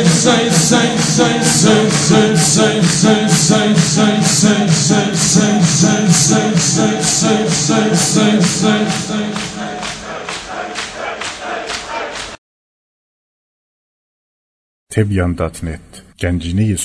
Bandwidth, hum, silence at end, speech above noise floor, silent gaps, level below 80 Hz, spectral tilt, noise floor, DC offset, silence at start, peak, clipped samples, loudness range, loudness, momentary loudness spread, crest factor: 11 kHz; none; 0 s; over 77 dB; 12.38-14.87 s; -40 dBFS; -4 dB/octave; under -90 dBFS; under 0.1%; 0 s; 0 dBFS; under 0.1%; 14 LU; -13 LUFS; 13 LU; 14 dB